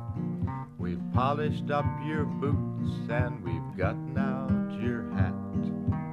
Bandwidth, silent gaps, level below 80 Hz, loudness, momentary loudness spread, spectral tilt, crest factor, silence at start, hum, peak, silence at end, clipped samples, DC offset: 7 kHz; none; -48 dBFS; -31 LUFS; 6 LU; -9 dB/octave; 18 dB; 0 s; none; -12 dBFS; 0 s; under 0.1%; under 0.1%